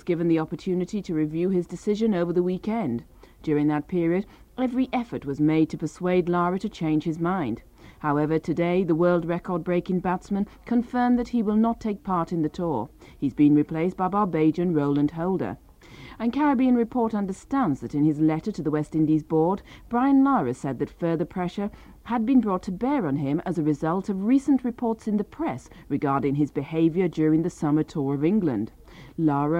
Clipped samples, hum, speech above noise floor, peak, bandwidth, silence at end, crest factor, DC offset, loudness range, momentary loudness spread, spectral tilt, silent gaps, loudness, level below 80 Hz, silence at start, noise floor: under 0.1%; none; 21 dB; -10 dBFS; 9.8 kHz; 0 s; 14 dB; under 0.1%; 2 LU; 8 LU; -8.5 dB/octave; none; -25 LUFS; -52 dBFS; 0.05 s; -45 dBFS